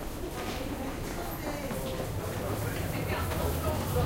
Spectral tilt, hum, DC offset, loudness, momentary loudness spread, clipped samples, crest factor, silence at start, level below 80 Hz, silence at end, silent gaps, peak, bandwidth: -5.5 dB/octave; none; under 0.1%; -34 LUFS; 5 LU; under 0.1%; 16 dB; 0 s; -40 dBFS; 0 s; none; -16 dBFS; 16 kHz